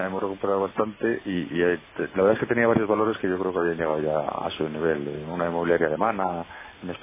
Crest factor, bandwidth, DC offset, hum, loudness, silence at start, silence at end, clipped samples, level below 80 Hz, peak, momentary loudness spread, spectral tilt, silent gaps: 18 dB; 3.8 kHz; under 0.1%; none; -25 LUFS; 0 s; 0 s; under 0.1%; -54 dBFS; -6 dBFS; 8 LU; -10.5 dB/octave; none